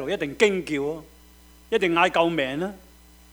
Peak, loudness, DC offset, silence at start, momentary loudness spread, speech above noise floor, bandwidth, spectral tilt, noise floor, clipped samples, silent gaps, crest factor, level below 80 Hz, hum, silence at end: -4 dBFS; -23 LUFS; under 0.1%; 0 s; 11 LU; 28 dB; over 20 kHz; -4.5 dB/octave; -51 dBFS; under 0.1%; none; 20 dB; -54 dBFS; none; 0.55 s